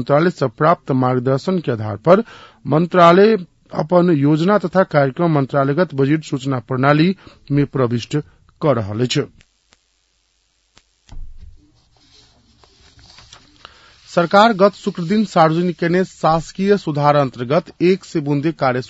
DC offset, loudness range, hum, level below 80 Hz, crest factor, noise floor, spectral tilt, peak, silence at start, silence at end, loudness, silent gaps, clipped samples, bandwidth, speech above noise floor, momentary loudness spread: under 0.1%; 9 LU; none; -48 dBFS; 18 dB; -63 dBFS; -7 dB/octave; 0 dBFS; 0 s; 0.05 s; -16 LUFS; none; under 0.1%; 8 kHz; 48 dB; 9 LU